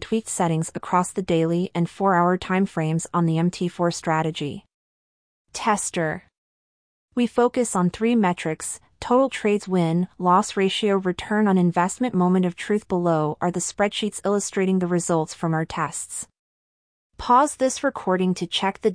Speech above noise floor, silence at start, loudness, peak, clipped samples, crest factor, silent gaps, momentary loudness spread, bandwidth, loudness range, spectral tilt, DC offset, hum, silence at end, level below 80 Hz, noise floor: over 68 dB; 0 s; -22 LUFS; -6 dBFS; under 0.1%; 16 dB; 4.74-5.45 s, 6.38-7.08 s, 16.39-17.10 s; 7 LU; 10.5 kHz; 4 LU; -5.5 dB/octave; under 0.1%; none; 0 s; -56 dBFS; under -90 dBFS